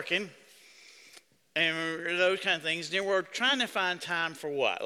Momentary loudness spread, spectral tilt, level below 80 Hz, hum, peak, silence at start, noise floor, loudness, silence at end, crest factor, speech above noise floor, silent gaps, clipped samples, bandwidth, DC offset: 5 LU; -2.5 dB/octave; -78 dBFS; none; -12 dBFS; 0 s; -58 dBFS; -29 LUFS; 0 s; 20 dB; 28 dB; none; under 0.1%; 15.5 kHz; under 0.1%